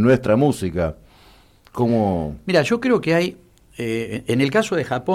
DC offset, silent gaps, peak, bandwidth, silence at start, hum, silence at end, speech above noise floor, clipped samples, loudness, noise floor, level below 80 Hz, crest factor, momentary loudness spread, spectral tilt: under 0.1%; none; -4 dBFS; 15.5 kHz; 0 s; none; 0 s; 32 dB; under 0.1%; -20 LUFS; -51 dBFS; -44 dBFS; 16 dB; 8 LU; -6.5 dB/octave